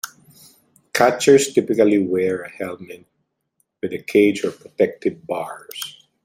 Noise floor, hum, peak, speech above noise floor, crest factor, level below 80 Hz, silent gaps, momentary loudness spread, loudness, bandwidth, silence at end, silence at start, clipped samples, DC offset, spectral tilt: -70 dBFS; none; 0 dBFS; 51 dB; 20 dB; -64 dBFS; none; 16 LU; -19 LUFS; 16 kHz; 0.35 s; 0.05 s; under 0.1%; under 0.1%; -4.5 dB/octave